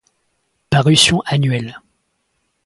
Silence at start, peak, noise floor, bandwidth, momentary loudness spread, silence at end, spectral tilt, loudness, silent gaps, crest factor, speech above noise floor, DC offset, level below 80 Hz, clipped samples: 0.7 s; 0 dBFS; -68 dBFS; 11.5 kHz; 12 LU; 0.85 s; -4 dB/octave; -14 LUFS; none; 18 dB; 53 dB; under 0.1%; -46 dBFS; under 0.1%